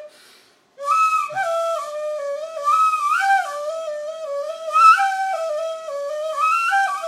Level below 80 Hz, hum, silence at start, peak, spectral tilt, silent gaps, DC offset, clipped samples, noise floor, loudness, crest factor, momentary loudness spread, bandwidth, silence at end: -90 dBFS; none; 0 s; -2 dBFS; 0.5 dB/octave; none; under 0.1%; under 0.1%; -53 dBFS; -19 LUFS; 18 dB; 14 LU; 15 kHz; 0 s